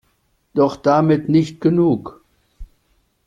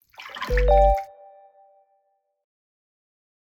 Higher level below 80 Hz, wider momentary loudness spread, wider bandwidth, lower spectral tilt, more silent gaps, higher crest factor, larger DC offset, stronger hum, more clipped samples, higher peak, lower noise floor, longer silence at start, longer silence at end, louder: second, -48 dBFS vs -30 dBFS; second, 9 LU vs 21 LU; about the same, 7.6 kHz vs 7.4 kHz; first, -8.5 dB/octave vs -6 dB/octave; neither; about the same, 16 dB vs 18 dB; neither; neither; neither; about the same, -4 dBFS vs -6 dBFS; second, -64 dBFS vs -70 dBFS; first, 0.55 s vs 0.2 s; second, 0.6 s vs 2.4 s; first, -17 LUFS vs -21 LUFS